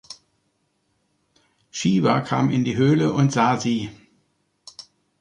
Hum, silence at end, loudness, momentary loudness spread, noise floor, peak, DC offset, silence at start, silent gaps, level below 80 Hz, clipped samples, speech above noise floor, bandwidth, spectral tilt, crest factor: none; 1.25 s; -20 LUFS; 23 LU; -70 dBFS; -6 dBFS; under 0.1%; 0.1 s; none; -58 dBFS; under 0.1%; 50 dB; 10.5 kHz; -6 dB/octave; 18 dB